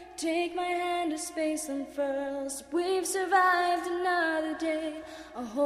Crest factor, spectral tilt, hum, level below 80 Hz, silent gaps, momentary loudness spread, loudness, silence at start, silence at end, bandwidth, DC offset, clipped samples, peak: 16 dB; -2 dB/octave; none; -64 dBFS; none; 11 LU; -29 LUFS; 0 s; 0 s; 15.5 kHz; under 0.1%; under 0.1%; -12 dBFS